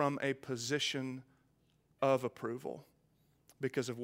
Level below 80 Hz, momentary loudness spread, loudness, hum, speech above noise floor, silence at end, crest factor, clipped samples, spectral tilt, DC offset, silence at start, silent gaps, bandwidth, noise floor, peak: -80 dBFS; 12 LU; -37 LUFS; none; 36 dB; 0 s; 22 dB; under 0.1%; -4.5 dB/octave; under 0.1%; 0 s; none; 16 kHz; -73 dBFS; -18 dBFS